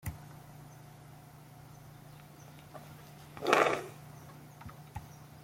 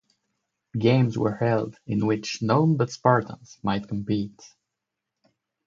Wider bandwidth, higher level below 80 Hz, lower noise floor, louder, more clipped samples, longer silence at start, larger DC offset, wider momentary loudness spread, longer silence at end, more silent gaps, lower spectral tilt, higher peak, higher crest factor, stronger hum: first, 16.5 kHz vs 7.6 kHz; about the same, -62 dBFS vs -58 dBFS; second, -53 dBFS vs -84 dBFS; second, -31 LUFS vs -24 LUFS; neither; second, 0.05 s vs 0.75 s; neither; first, 25 LU vs 9 LU; second, 0 s vs 1.2 s; neither; second, -4.5 dB/octave vs -7 dB/octave; about the same, -6 dBFS vs -4 dBFS; first, 32 dB vs 22 dB; neither